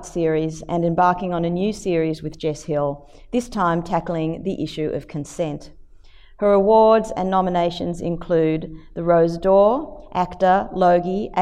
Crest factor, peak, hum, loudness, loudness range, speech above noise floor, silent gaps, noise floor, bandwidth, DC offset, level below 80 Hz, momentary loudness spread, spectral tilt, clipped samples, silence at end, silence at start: 16 dB; -4 dBFS; none; -20 LUFS; 6 LU; 25 dB; none; -45 dBFS; 12 kHz; under 0.1%; -44 dBFS; 11 LU; -7 dB/octave; under 0.1%; 0 s; 0 s